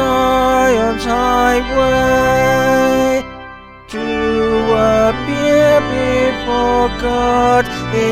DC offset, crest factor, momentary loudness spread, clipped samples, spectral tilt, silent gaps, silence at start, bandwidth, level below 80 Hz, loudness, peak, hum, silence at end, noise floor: under 0.1%; 12 dB; 6 LU; under 0.1%; -5 dB/octave; none; 0 s; 16 kHz; -32 dBFS; -14 LUFS; -2 dBFS; none; 0 s; -34 dBFS